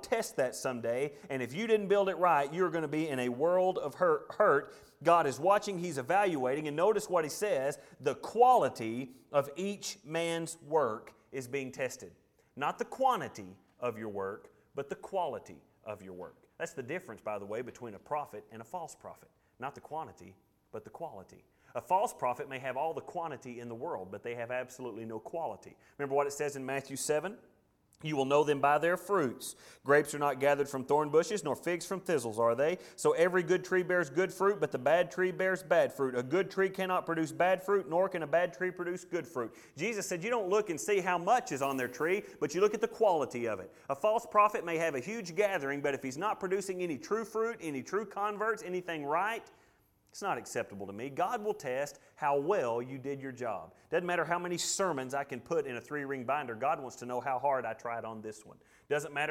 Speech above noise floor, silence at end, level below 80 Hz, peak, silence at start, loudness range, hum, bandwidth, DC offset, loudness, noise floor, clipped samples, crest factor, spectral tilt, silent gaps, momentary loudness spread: 36 dB; 0 s; -74 dBFS; -12 dBFS; 0 s; 10 LU; none; 18 kHz; under 0.1%; -33 LUFS; -68 dBFS; under 0.1%; 20 dB; -4.5 dB/octave; none; 15 LU